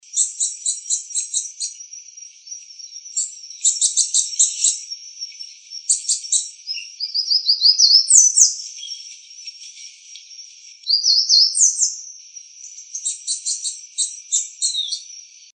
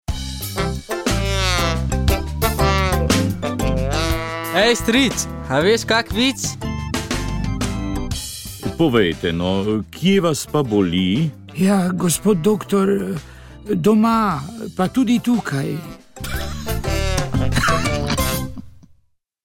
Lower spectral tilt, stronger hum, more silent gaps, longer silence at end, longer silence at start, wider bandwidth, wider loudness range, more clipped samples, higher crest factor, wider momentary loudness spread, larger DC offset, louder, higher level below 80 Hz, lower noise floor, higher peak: second, 12 dB/octave vs -5 dB/octave; neither; neither; second, 0.3 s vs 0.65 s; about the same, 0.15 s vs 0.1 s; second, 11.5 kHz vs 17 kHz; first, 9 LU vs 3 LU; neither; about the same, 20 dB vs 16 dB; first, 25 LU vs 10 LU; neither; first, -16 LUFS vs -19 LUFS; second, under -90 dBFS vs -30 dBFS; second, -41 dBFS vs -61 dBFS; first, 0 dBFS vs -4 dBFS